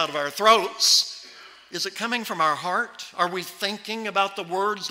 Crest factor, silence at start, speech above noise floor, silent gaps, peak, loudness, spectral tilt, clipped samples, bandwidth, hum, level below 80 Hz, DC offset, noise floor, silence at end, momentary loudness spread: 20 dB; 0 s; 22 dB; none; -6 dBFS; -23 LUFS; -1 dB/octave; under 0.1%; 16 kHz; none; -70 dBFS; under 0.1%; -46 dBFS; 0 s; 12 LU